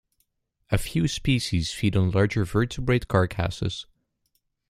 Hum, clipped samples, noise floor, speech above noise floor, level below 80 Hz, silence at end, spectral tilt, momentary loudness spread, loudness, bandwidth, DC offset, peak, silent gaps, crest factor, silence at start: none; under 0.1%; -73 dBFS; 50 dB; -42 dBFS; 0.85 s; -6 dB/octave; 6 LU; -25 LUFS; 15 kHz; under 0.1%; -6 dBFS; none; 20 dB; 0.7 s